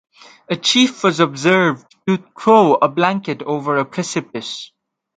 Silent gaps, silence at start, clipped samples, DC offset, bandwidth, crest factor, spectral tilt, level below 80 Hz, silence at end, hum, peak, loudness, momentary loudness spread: none; 0.5 s; under 0.1%; under 0.1%; 9.4 kHz; 18 dB; -4.5 dB/octave; -66 dBFS; 0.5 s; none; 0 dBFS; -16 LUFS; 13 LU